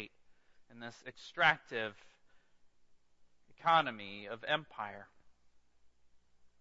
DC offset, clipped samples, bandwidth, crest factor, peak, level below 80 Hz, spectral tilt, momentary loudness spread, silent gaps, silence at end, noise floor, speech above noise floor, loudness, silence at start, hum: under 0.1%; under 0.1%; 7.6 kHz; 26 dB; -14 dBFS; -78 dBFS; -0.5 dB/octave; 20 LU; none; 0.15 s; -66 dBFS; 30 dB; -34 LUFS; 0 s; none